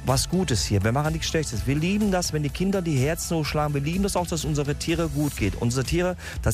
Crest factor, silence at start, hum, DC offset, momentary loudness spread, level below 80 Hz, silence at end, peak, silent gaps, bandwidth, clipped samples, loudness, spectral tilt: 16 dB; 0 s; none; under 0.1%; 3 LU; -36 dBFS; 0 s; -8 dBFS; none; 16 kHz; under 0.1%; -25 LUFS; -5 dB/octave